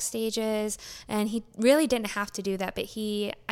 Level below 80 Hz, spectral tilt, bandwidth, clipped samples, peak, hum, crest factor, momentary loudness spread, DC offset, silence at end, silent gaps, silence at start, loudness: -56 dBFS; -3.5 dB/octave; 17 kHz; under 0.1%; -8 dBFS; none; 20 dB; 10 LU; under 0.1%; 0 s; none; 0 s; -28 LUFS